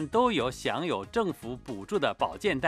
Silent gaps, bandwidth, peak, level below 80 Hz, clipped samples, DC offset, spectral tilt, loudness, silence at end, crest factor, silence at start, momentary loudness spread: none; 15 kHz; -10 dBFS; -54 dBFS; under 0.1%; under 0.1%; -5 dB/octave; -30 LUFS; 0 s; 18 dB; 0 s; 12 LU